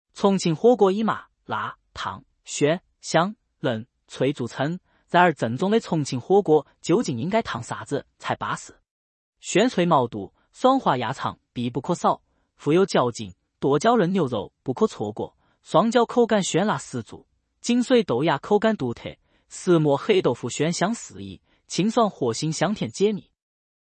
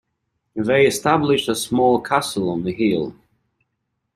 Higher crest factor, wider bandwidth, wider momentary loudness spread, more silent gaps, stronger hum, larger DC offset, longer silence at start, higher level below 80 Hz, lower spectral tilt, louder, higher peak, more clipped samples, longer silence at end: about the same, 20 dB vs 18 dB; second, 8.8 kHz vs 15.5 kHz; first, 13 LU vs 9 LU; first, 8.91-9.32 s vs none; neither; neither; second, 0.15 s vs 0.55 s; second, -62 dBFS vs -54 dBFS; about the same, -5.5 dB/octave vs -4.5 dB/octave; second, -23 LUFS vs -19 LUFS; about the same, -4 dBFS vs -2 dBFS; neither; second, 0.65 s vs 1.05 s